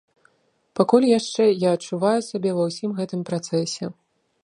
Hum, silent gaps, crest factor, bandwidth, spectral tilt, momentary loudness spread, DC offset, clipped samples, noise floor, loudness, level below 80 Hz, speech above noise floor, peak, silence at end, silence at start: none; none; 20 dB; 11 kHz; -5.5 dB/octave; 11 LU; under 0.1%; under 0.1%; -66 dBFS; -22 LUFS; -72 dBFS; 45 dB; -2 dBFS; 0.55 s; 0.75 s